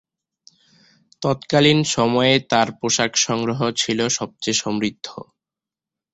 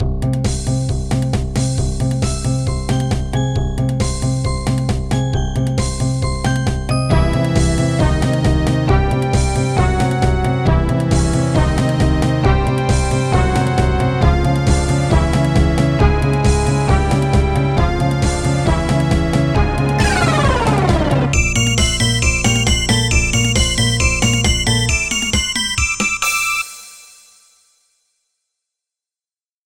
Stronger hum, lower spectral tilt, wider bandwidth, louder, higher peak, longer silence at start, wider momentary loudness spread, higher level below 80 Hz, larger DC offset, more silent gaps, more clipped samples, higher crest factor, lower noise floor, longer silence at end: neither; second, -3.5 dB/octave vs -5 dB/octave; second, 8.4 kHz vs 16.5 kHz; second, -19 LUFS vs -16 LUFS; about the same, -2 dBFS vs 0 dBFS; first, 1.2 s vs 0 s; first, 10 LU vs 5 LU; second, -56 dBFS vs -22 dBFS; neither; neither; neither; about the same, 20 dB vs 16 dB; about the same, -88 dBFS vs under -90 dBFS; second, 0.9 s vs 2.65 s